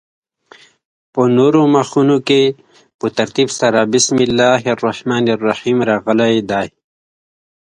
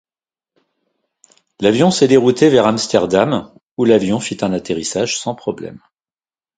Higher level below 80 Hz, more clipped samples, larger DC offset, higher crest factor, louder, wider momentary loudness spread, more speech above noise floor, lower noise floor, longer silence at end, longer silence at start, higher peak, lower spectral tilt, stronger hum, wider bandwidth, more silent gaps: about the same, -56 dBFS vs -52 dBFS; neither; neither; about the same, 14 dB vs 16 dB; about the same, -14 LUFS vs -15 LUFS; second, 8 LU vs 12 LU; second, 32 dB vs over 75 dB; second, -46 dBFS vs under -90 dBFS; first, 1.05 s vs 0.8 s; second, 1.15 s vs 1.6 s; about the same, 0 dBFS vs 0 dBFS; about the same, -4.5 dB/octave vs -5 dB/octave; neither; first, 11 kHz vs 9.4 kHz; second, 2.94-2.99 s vs 3.63-3.76 s